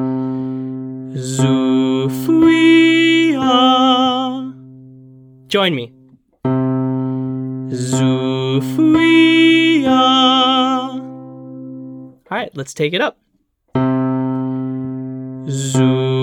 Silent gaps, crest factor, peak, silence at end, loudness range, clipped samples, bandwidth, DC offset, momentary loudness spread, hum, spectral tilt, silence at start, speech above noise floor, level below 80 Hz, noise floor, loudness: none; 14 dB; 0 dBFS; 0 s; 9 LU; under 0.1%; 16 kHz; under 0.1%; 17 LU; none; -5.5 dB/octave; 0 s; 50 dB; -56 dBFS; -63 dBFS; -15 LUFS